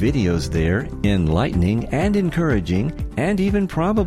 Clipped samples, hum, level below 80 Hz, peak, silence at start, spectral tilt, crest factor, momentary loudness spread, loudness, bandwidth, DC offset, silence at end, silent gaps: under 0.1%; none; -30 dBFS; -6 dBFS; 0 s; -7.5 dB/octave; 12 dB; 3 LU; -20 LUFS; 12.5 kHz; under 0.1%; 0 s; none